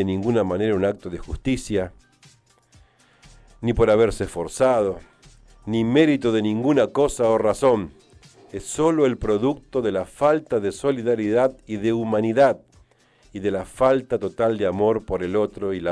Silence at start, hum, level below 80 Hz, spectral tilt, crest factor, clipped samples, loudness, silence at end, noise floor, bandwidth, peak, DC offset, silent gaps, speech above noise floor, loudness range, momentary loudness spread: 0 s; none; -44 dBFS; -6 dB/octave; 16 dB; under 0.1%; -22 LUFS; 0 s; -57 dBFS; 11 kHz; -6 dBFS; under 0.1%; none; 36 dB; 4 LU; 10 LU